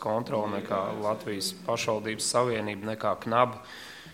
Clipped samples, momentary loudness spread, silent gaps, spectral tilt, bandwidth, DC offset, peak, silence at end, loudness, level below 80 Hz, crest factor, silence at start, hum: under 0.1%; 7 LU; none; -4 dB/octave; 16.5 kHz; under 0.1%; -8 dBFS; 0 s; -29 LUFS; -66 dBFS; 22 dB; 0 s; none